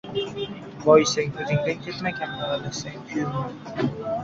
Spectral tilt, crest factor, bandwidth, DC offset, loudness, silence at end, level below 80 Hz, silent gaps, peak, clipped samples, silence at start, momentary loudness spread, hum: -5 dB/octave; 22 dB; 7.8 kHz; under 0.1%; -25 LUFS; 0 s; -56 dBFS; none; -4 dBFS; under 0.1%; 0.05 s; 15 LU; none